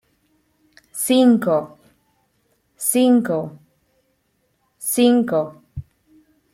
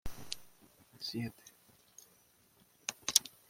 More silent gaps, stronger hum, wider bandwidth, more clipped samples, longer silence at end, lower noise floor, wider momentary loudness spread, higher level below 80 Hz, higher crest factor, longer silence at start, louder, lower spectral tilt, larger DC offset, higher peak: neither; neither; about the same, 16.5 kHz vs 16.5 kHz; neither; first, 0.7 s vs 0.2 s; about the same, -67 dBFS vs -68 dBFS; second, 22 LU vs 28 LU; about the same, -58 dBFS vs -62 dBFS; second, 18 dB vs 36 dB; first, 0.95 s vs 0.05 s; first, -18 LUFS vs -37 LUFS; first, -4.5 dB/octave vs -1 dB/octave; neither; about the same, -4 dBFS vs -4 dBFS